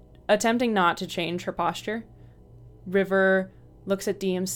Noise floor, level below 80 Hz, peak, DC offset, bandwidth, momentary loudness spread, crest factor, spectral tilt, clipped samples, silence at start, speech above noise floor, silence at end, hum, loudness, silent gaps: -49 dBFS; -56 dBFS; -8 dBFS; under 0.1%; 18 kHz; 12 LU; 18 dB; -4.5 dB/octave; under 0.1%; 0.3 s; 24 dB; 0 s; 60 Hz at -55 dBFS; -25 LUFS; none